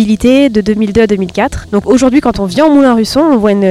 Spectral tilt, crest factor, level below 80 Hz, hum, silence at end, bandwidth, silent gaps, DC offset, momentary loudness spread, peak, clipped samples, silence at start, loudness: -6 dB/octave; 8 dB; -32 dBFS; none; 0 s; 14 kHz; none; under 0.1%; 6 LU; 0 dBFS; 0.4%; 0 s; -9 LUFS